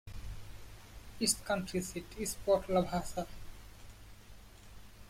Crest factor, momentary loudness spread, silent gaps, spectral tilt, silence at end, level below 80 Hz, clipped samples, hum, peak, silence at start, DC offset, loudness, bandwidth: 20 dB; 25 LU; none; -4 dB/octave; 0 s; -52 dBFS; under 0.1%; none; -16 dBFS; 0.05 s; under 0.1%; -35 LUFS; 16.5 kHz